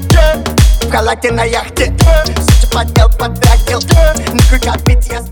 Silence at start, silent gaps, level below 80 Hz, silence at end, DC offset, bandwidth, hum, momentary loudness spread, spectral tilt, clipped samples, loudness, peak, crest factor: 0 s; none; -12 dBFS; 0 s; under 0.1%; over 20 kHz; none; 4 LU; -5 dB/octave; 0.8%; -11 LUFS; 0 dBFS; 8 dB